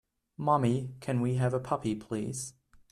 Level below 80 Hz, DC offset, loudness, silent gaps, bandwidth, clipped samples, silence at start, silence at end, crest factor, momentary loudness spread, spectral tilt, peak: -62 dBFS; under 0.1%; -31 LUFS; none; 13 kHz; under 0.1%; 0.4 s; 0.4 s; 18 dB; 9 LU; -6.5 dB/octave; -14 dBFS